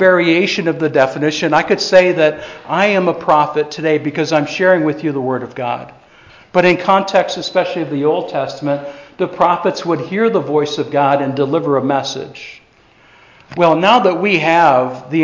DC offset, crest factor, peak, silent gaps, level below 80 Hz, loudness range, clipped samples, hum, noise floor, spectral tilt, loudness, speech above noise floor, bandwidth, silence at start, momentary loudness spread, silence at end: under 0.1%; 14 dB; 0 dBFS; none; -58 dBFS; 3 LU; under 0.1%; none; -49 dBFS; -5.5 dB/octave; -14 LUFS; 34 dB; 7.6 kHz; 0 s; 11 LU; 0 s